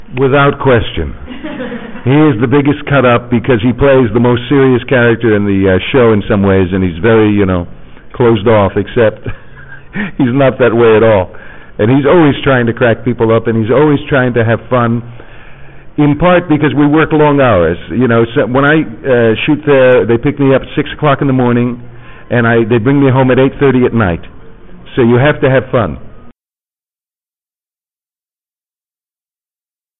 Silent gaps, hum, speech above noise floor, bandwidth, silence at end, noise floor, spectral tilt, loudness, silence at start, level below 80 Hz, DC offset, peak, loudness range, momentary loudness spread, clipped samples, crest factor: none; none; over 81 dB; 4 kHz; 3.7 s; under -90 dBFS; -11.5 dB/octave; -10 LUFS; 0 s; -34 dBFS; 1%; 0 dBFS; 3 LU; 11 LU; under 0.1%; 10 dB